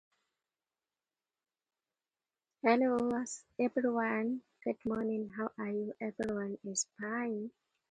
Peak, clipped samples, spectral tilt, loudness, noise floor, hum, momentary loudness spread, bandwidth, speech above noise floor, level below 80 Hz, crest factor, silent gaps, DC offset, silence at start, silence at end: -16 dBFS; under 0.1%; -4.5 dB/octave; -35 LUFS; under -90 dBFS; none; 10 LU; 9.4 kHz; over 55 dB; -74 dBFS; 20 dB; none; under 0.1%; 2.65 s; 0.4 s